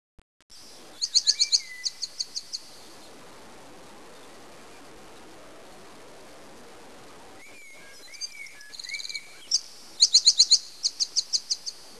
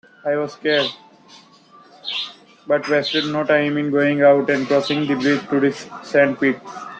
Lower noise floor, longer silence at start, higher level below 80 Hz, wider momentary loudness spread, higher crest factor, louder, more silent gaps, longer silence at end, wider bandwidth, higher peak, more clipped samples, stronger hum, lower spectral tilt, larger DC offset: about the same, -48 dBFS vs -48 dBFS; first, 1 s vs 0.25 s; about the same, -70 dBFS vs -66 dBFS; first, 29 LU vs 11 LU; first, 26 dB vs 16 dB; second, -23 LUFS vs -19 LUFS; neither; first, 0.25 s vs 0 s; first, 12 kHz vs 8.4 kHz; about the same, -4 dBFS vs -4 dBFS; neither; neither; second, 2.5 dB/octave vs -5.5 dB/octave; first, 0.4% vs under 0.1%